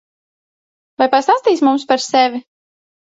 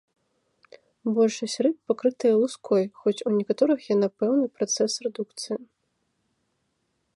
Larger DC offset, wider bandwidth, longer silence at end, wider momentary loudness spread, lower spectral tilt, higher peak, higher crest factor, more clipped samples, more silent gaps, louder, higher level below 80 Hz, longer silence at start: neither; second, 8 kHz vs 11.5 kHz; second, 0.7 s vs 1.5 s; second, 5 LU vs 10 LU; second, -2.5 dB/octave vs -4.5 dB/octave; first, 0 dBFS vs -8 dBFS; about the same, 16 dB vs 18 dB; neither; neither; first, -14 LUFS vs -25 LUFS; first, -66 dBFS vs -78 dBFS; about the same, 1 s vs 1.05 s